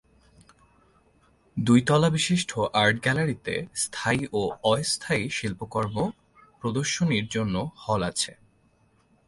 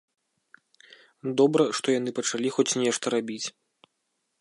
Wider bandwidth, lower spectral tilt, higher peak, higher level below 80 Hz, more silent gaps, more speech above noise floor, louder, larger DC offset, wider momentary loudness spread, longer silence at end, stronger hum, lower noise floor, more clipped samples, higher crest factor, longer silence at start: about the same, 11.5 kHz vs 11.5 kHz; about the same, -4.5 dB/octave vs -3.5 dB/octave; about the same, -8 dBFS vs -8 dBFS; first, -54 dBFS vs -82 dBFS; neither; second, 38 dB vs 53 dB; about the same, -25 LUFS vs -26 LUFS; neither; second, 9 LU vs 12 LU; about the same, 0.95 s vs 0.9 s; neither; second, -64 dBFS vs -78 dBFS; neither; about the same, 20 dB vs 20 dB; first, 1.55 s vs 1.25 s